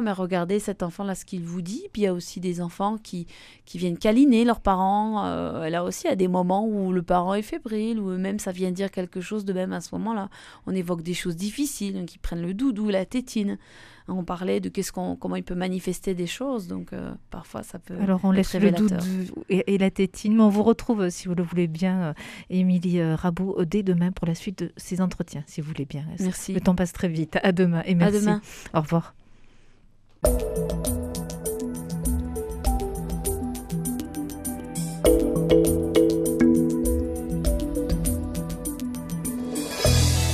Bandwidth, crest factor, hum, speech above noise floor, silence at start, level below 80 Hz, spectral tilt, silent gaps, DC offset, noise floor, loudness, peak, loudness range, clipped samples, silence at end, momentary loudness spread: 14.5 kHz; 20 dB; none; 29 dB; 0 s; -38 dBFS; -6 dB/octave; none; under 0.1%; -54 dBFS; -25 LUFS; -4 dBFS; 7 LU; under 0.1%; 0 s; 12 LU